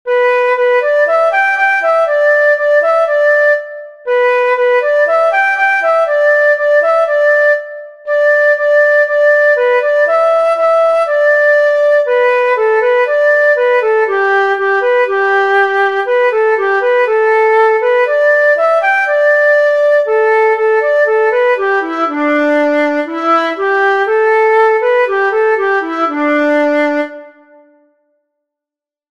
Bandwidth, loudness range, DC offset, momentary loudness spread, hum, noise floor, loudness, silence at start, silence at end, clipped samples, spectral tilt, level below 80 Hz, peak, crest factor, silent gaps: 10 kHz; 2 LU; 0.3%; 4 LU; none; -87 dBFS; -11 LUFS; 0.05 s; 1.8 s; under 0.1%; -2.5 dB/octave; -68 dBFS; -2 dBFS; 10 dB; none